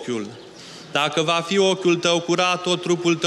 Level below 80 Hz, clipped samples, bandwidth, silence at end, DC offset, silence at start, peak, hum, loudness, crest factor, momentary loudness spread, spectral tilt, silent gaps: -68 dBFS; under 0.1%; 12 kHz; 0 s; under 0.1%; 0 s; -6 dBFS; none; -20 LUFS; 16 dB; 18 LU; -4 dB/octave; none